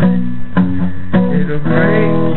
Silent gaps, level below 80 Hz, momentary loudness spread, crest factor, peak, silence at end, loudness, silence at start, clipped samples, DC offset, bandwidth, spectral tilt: none; -34 dBFS; 6 LU; 14 dB; 0 dBFS; 0 s; -14 LUFS; 0 s; under 0.1%; 20%; 4.2 kHz; -7.5 dB/octave